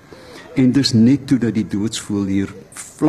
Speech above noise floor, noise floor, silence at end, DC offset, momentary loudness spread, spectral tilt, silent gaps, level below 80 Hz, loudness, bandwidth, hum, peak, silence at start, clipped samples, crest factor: 22 dB; -39 dBFS; 0 s; under 0.1%; 17 LU; -6 dB/octave; none; -52 dBFS; -17 LUFS; 13.5 kHz; none; -4 dBFS; 0.2 s; under 0.1%; 12 dB